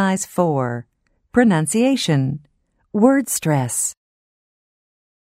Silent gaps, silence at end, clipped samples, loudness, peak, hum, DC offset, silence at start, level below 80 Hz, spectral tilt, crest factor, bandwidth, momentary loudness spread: none; 1.45 s; under 0.1%; -18 LUFS; -2 dBFS; none; under 0.1%; 0 s; -56 dBFS; -5 dB/octave; 18 dB; 16 kHz; 10 LU